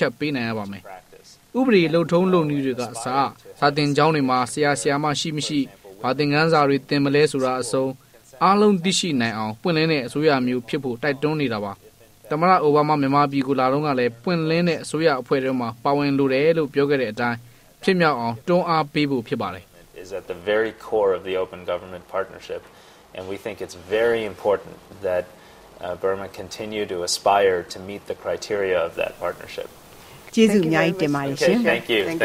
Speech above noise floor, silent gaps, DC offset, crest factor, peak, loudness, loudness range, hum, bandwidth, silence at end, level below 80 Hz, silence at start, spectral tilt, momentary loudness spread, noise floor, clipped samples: 23 dB; none; under 0.1%; 18 dB; -2 dBFS; -21 LUFS; 6 LU; none; 16 kHz; 0 s; -58 dBFS; 0 s; -5 dB/octave; 15 LU; -44 dBFS; under 0.1%